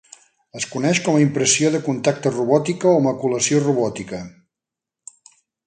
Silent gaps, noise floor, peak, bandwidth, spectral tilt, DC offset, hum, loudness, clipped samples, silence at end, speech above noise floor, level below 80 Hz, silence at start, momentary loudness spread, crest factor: none; -87 dBFS; -4 dBFS; 9.6 kHz; -4.5 dB/octave; under 0.1%; none; -19 LUFS; under 0.1%; 1.4 s; 68 dB; -60 dBFS; 0.55 s; 14 LU; 18 dB